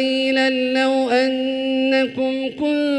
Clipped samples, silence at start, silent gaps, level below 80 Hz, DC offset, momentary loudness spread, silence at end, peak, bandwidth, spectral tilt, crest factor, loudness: under 0.1%; 0 s; none; -62 dBFS; under 0.1%; 5 LU; 0 s; -6 dBFS; 11 kHz; -3.5 dB/octave; 14 dB; -19 LUFS